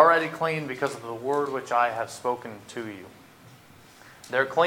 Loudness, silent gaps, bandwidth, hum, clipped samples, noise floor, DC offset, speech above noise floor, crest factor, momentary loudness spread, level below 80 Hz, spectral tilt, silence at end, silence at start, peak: -27 LUFS; none; 18 kHz; none; under 0.1%; -52 dBFS; under 0.1%; 24 dB; 24 dB; 14 LU; -70 dBFS; -4.5 dB/octave; 0 s; 0 s; -2 dBFS